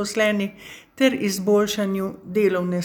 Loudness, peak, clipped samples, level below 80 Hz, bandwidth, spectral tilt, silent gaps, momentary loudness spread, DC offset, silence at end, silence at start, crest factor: -22 LUFS; -6 dBFS; under 0.1%; -60 dBFS; over 20 kHz; -5 dB/octave; none; 10 LU; under 0.1%; 0 s; 0 s; 16 dB